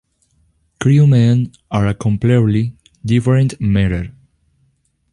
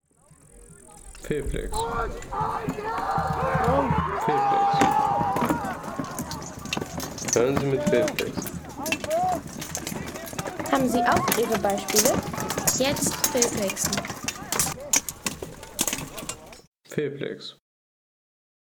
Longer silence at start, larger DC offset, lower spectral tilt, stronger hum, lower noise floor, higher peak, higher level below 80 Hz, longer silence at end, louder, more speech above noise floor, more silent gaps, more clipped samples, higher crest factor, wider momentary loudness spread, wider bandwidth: first, 0.8 s vs 0.55 s; neither; first, -8 dB/octave vs -3.5 dB/octave; neither; first, -61 dBFS vs -56 dBFS; about the same, -2 dBFS vs -4 dBFS; first, -36 dBFS vs -44 dBFS; about the same, 1 s vs 1.1 s; first, -15 LUFS vs -25 LUFS; first, 48 dB vs 32 dB; second, none vs 16.67-16.72 s; neither; second, 14 dB vs 22 dB; about the same, 12 LU vs 12 LU; second, 11 kHz vs over 20 kHz